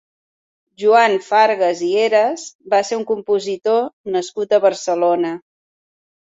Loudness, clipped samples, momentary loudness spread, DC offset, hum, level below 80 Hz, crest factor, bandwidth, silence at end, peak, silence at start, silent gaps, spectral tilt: -17 LUFS; under 0.1%; 9 LU; under 0.1%; none; -68 dBFS; 16 dB; 8 kHz; 0.95 s; -2 dBFS; 0.8 s; 2.55-2.59 s, 3.93-4.04 s; -3.5 dB/octave